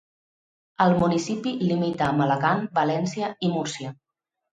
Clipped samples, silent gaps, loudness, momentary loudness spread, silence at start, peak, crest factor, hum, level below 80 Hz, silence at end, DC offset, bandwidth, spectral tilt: under 0.1%; none; -24 LUFS; 7 LU; 0.8 s; -6 dBFS; 18 dB; none; -58 dBFS; 0.6 s; under 0.1%; 9.4 kHz; -6 dB/octave